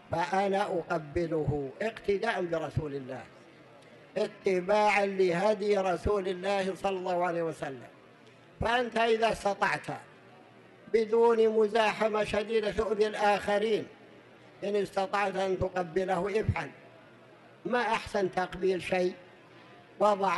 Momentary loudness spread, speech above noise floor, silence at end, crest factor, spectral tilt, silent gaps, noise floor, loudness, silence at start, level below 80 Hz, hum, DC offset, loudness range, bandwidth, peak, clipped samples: 10 LU; 27 dB; 0 s; 18 dB; -5.5 dB/octave; none; -56 dBFS; -29 LUFS; 0.1 s; -54 dBFS; none; under 0.1%; 5 LU; 12 kHz; -12 dBFS; under 0.1%